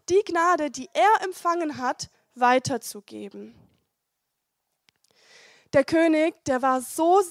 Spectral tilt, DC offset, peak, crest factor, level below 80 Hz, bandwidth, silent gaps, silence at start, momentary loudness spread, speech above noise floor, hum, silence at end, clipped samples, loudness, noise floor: -4 dB/octave; under 0.1%; -8 dBFS; 18 dB; -64 dBFS; 15.5 kHz; none; 0.1 s; 18 LU; 57 dB; none; 0 s; under 0.1%; -23 LUFS; -80 dBFS